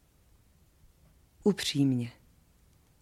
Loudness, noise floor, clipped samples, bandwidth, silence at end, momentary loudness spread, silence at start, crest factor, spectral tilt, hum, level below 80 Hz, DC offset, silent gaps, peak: -30 LUFS; -63 dBFS; under 0.1%; 15 kHz; 0.9 s; 7 LU; 1.45 s; 20 dB; -5.5 dB/octave; none; -64 dBFS; under 0.1%; none; -14 dBFS